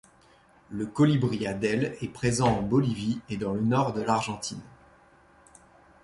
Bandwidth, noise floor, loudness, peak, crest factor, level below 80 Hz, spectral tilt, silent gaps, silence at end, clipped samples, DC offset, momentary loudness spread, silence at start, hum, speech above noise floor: 11.5 kHz; -59 dBFS; -27 LUFS; -10 dBFS; 18 dB; -54 dBFS; -6 dB/octave; none; 1.3 s; under 0.1%; under 0.1%; 11 LU; 0.7 s; none; 32 dB